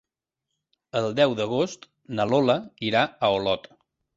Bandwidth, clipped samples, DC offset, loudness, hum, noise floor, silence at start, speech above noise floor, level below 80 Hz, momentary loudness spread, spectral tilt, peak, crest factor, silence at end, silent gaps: 7.8 kHz; under 0.1%; under 0.1%; -24 LUFS; none; -85 dBFS; 0.95 s; 61 dB; -62 dBFS; 9 LU; -5.5 dB/octave; -6 dBFS; 20 dB; 0.55 s; none